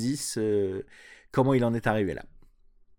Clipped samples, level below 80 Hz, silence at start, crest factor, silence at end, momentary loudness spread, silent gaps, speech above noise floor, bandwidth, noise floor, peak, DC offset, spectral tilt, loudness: under 0.1%; -56 dBFS; 0 s; 18 dB; 0.6 s; 14 LU; none; 31 dB; 19 kHz; -58 dBFS; -10 dBFS; under 0.1%; -6 dB/octave; -27 LUFS